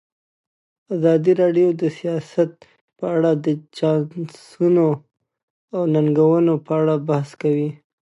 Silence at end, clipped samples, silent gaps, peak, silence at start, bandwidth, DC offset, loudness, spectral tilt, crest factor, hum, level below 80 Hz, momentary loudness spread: 0.35 s; under 0.1%; 2.81-2.88 s, 5.43-5.68 s; -4 dBFS; 0.9 s; 11 kHz; under 0.1%; -19 LUFS; -9 dB/octave; 14 dB; none; -72 dBFS; 12 LU